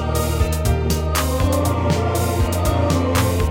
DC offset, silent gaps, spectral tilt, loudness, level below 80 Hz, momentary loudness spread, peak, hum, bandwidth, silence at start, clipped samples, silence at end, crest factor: under 0.1%; none; -5.5 dB/octave; -19 LUFS; -24 dBFS; 2 LU; -4 dBFS; none; 17 kHz; 0 s; under 0.1%; 0 s; 14 dB